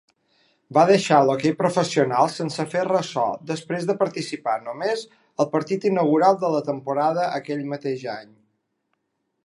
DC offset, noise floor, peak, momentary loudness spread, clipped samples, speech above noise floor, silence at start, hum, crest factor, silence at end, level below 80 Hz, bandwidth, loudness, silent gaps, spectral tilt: under 0.1%; -76 dBFS; -2 dBFS; 11 LU; under 0.1%; 54 dB; 0.7 s; none; 20 dB; 1.2 s; -74 dBFS; 11.5 kHz; -22 LUFS; none; -5.5 dB/octave